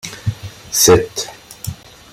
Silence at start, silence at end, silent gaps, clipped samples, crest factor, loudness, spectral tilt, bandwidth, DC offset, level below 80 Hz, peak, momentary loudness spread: 0.05 s; 0.4 s; none; under 0.1%; 18 dB; -15 LUFS; -3.5 dB/octave; 16.5 kHz; under 0.1%; -42 dBFS; 0 dBFS; 20 LU